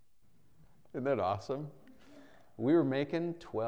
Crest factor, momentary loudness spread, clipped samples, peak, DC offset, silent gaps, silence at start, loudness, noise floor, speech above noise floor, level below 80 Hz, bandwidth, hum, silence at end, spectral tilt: 18 dB; 12 LU; under 0.1%; -18 dBFS; 0.1%; none; 0.95 s; -33 LUFS; -70 dBFS; 38 dB; -72 dBFS; 7.8 kHz; none; 0 s; -8 dB/octave